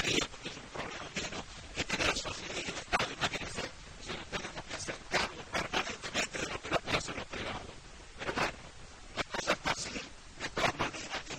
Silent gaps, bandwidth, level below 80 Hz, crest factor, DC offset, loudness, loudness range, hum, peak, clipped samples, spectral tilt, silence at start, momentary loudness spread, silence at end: none; 16 kHz; -54 dBFS; 22 dB; under 0.1%; -36 LUFS; 2 LU; none; -14 dBFS; under 0.1%; -2.5 dB/octave; 0 s; 11 LU; 0 s